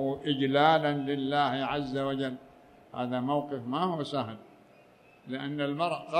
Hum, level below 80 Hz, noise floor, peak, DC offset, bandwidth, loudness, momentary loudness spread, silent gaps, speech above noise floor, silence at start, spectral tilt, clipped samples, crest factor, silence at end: none; -66 dBFS; -58 dBFS; -10 dBFS; under 0.1%; 10 kHz; -30 LUFS; 14 LU; none; 29 dB; 0 s; -7 dB/octave; under 0.1%; 20 dB; 0 s